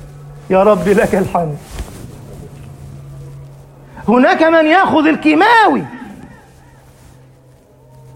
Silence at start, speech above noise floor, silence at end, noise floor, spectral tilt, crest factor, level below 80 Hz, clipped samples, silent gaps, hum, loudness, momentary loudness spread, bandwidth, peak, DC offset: 0 s; 34 dB; 1.9 s; -45 dBFS; -6 dB/octave; 14 dB; -40 dBFS; under 0.1%; none; none; -11 LUFS; 25 LU; 16.5 kHz; 0 dBFS; under 0.1%